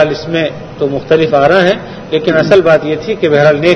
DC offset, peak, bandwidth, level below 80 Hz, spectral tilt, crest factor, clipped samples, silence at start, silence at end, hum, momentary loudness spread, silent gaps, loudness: under 0.1%; 0 dBFS; 7.8 kHz; -42 dBFS; -6.5 dB/octave; 10 dB; 0.7%; 0 s; 0 s; none; 9 LU; none; -11 LUFS